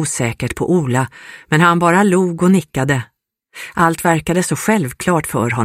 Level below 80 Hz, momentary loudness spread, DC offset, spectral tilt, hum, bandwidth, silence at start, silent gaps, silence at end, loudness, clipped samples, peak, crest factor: -44 dBFS; 9 LU; under 0.1%; -5.5 dB/octave; none; 16 kHz; 0 s; none; 0 s; -15 LUFS; under 0.1%; 0 dBFS; 16 dB